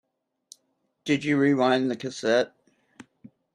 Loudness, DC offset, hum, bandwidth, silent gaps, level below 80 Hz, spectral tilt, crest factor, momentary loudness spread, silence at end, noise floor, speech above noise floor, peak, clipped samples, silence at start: -24 LUFS; under 0.1%; none; 10.5 kHz; none; -72 dBFS; -5.5 dB/octave; 18 dB; 9 LU; 0.5 s; -73 dBFS; 50 dB; -8 dBFS; under 0.1%; 1.05 s